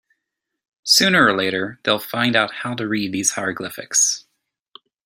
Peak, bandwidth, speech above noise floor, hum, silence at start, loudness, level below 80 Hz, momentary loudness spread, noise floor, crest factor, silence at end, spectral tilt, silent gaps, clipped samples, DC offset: 0 dBFS; 16.5 kHz; 61 dB; none; 0.85 s; -18 LUFS; -62 dBFS; 12 LU; -80 dBFS; 20 dB; 0.85 s; -2 dB/octave; none; under 0.1%; under 0.1%